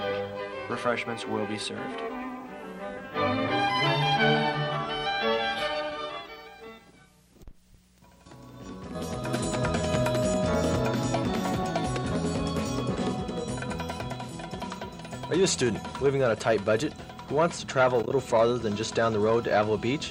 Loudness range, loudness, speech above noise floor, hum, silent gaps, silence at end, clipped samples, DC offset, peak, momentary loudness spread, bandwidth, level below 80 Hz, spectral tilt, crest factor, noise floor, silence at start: 7 LU; -28 LUFS; 31 dB; none; none; 0 s; under 0.1%; under 0.1%; -12 dBFS; 14 LU; 16 kHz; -50 dBFS; -5 dB/octave; 16 dB; -58 dBFS; 0 s